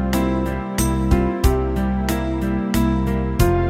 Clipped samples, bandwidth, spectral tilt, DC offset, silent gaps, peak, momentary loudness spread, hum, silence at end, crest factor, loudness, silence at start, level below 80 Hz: under 0.1%; 16 kHz; -6.5 dB/octave; under 0.1%; none; -2 dBFS; 4 LU; none; 0 s; 18 dB; -20 LUFS; 0 s; -24 dBFS